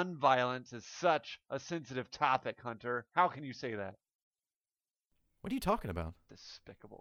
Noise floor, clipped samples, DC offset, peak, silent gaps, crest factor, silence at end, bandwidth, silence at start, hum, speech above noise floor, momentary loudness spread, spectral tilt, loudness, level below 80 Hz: under -90 dBFS; under 0.1%; under 0.1%; -14 dBFS; 4.15-4.31 s, 4.56-4.61 s; 22 dB; 0.05 s; 17.5 kHz; 0 s; none; over 54 dB; 19 LU; -5 dB/octave; -35 LUFS; -60 dBFS